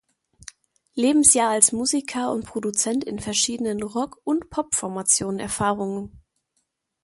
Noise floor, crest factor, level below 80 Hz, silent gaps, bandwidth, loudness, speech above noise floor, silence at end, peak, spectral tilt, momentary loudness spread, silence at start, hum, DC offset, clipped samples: -74 dBFS; 24 dB; -54 dBFS; none; 12 kHz; -21 LUFS; 51 dB; 0.85 s; 0 dBFS; -2.5 dB/octave; 12 LU; 0.95 s; none; under 0.1%; under 0.1%